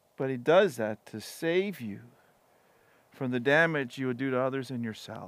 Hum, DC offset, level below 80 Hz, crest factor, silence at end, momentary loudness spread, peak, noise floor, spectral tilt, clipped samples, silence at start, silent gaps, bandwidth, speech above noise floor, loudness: none; under 0.1%; -84 dBFS; 20 dB; 0 s; 16 LU; -10 dBFS; -65 dBFS; -6 dB/octave; under 0.1%; 0.2 s; none; 15.5 kHz; 36 dB; -29 LUFS